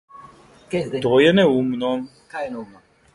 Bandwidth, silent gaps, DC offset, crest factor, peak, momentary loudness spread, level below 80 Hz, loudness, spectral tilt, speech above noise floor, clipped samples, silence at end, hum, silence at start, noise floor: 11.5 kHz; none; under 0.1%; 18 dB; -4 dBFS; 16 LU; -56 dBFS; -20 LUFS; -6.5 dB/octave; 28 dB; under 0.1%; 0.5 s; none; 0.15 s; -47 dBFS